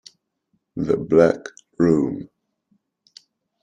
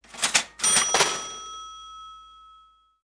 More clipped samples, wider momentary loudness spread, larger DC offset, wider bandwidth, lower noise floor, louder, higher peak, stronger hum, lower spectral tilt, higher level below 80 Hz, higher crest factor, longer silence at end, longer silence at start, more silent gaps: neither; second, 19 LU vs 23 LU; neither; second, 9.4 kHz vs 10.5 kHz; first, -71 dBFS vs -57 dBFS; about the same, -20 LUFS vs -21 LUFS; about the same, -2 dBFS vs -2 dBFS; neither; first, -8 dB/octave vs 1 dB/octave; first, -56 dBFS vs -62 dBFS; second, 20 dB vs 26 dB; first, 1.35 s vs 0.75 s; first, 0.75 s vs 0.15 s; neither